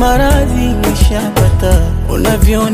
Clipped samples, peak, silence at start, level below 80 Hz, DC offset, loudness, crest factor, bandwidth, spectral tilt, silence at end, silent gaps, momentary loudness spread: under 0.1%; 0 dBFS; 0 s; -14 dBFS; under 0.1%; -12 LUFS; 10 dB; 15.5 kHz; -6 dB/octave; 0 s; none; 3 LU